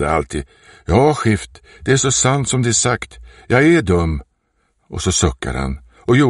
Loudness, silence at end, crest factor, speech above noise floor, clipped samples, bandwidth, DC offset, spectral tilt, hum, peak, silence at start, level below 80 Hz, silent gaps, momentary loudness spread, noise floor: -16 LUFS; 0 s; 16 dB; 48 dB; under 0.1%; 11.5 kHz; under 0.1%; -4.5 dB/octave; none; -2 dBFS; 0 s; -32 dBFS; none; 15 LU; -65 dBFS